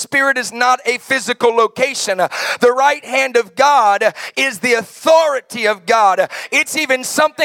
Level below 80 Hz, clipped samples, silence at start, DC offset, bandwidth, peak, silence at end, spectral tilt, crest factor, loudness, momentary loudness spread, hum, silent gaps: -70 dBFS; under 0.1%; 0 s; under 0.1%; 17.5 kHz; 0 dBFS; 0 s; -1.5 dB/octave; 14 dB; -14 LUFS; 5 LU; none; none